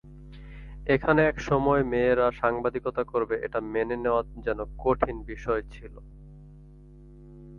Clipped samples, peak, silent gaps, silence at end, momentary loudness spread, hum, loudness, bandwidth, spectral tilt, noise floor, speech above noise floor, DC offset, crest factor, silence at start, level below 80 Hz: under 0.1%; -8 dBFS; none; 0 s; 22 LU; none; -26 LUFS; 7 kHz; -7.5 dB/octave; -49 dBFS; 23 dB; under 0.1%; 20 dB; 0.05 s; -44 dBFS